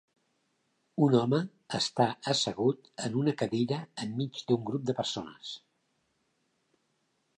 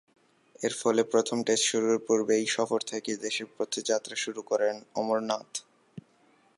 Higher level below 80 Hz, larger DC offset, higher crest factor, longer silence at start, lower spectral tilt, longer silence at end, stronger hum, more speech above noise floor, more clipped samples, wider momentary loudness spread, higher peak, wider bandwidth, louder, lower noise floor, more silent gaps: first, -72 dBFS vs -80 dBFS; neither; about the same, 20 dB vs 18 dB; first, 0.95 s vs 0.6 s; first, -5.5 dB/octave vs -2.5 dB/octave; first, 1.8 s vs 0.6 s; neither; first, 46 dB vs 36 dB; neither; first, 12 LU vs 8 LU; about the same, -12 dBFS vs -12 dBFS; about the same, 11 kHz vs 11.5 kHz; about the same, -30 LUFS vs -29 LUFS; first, -76 dBFS vs -64 dBFS; neither